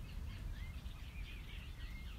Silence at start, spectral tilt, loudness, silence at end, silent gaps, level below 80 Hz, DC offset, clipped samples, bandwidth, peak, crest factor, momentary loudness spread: 0 s; -5 dB/octave; -50 LUFS; 0 s; none; -48 dBFS; under 0.1%; under 0.1%; 16 kHz; -34 dBFS; 12 dB; 2 LU